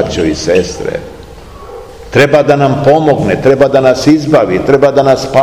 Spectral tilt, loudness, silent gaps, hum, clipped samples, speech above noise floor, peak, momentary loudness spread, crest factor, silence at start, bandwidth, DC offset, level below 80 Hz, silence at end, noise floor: -6 dB/octave; -9 LUFS; none; none; 3%; 22 dB; 0 dBFS; 17 LU; 10 dB; 0 s; 15.5 kHz; 0.7%; -34 dBFS; 0 s; -30 dBFS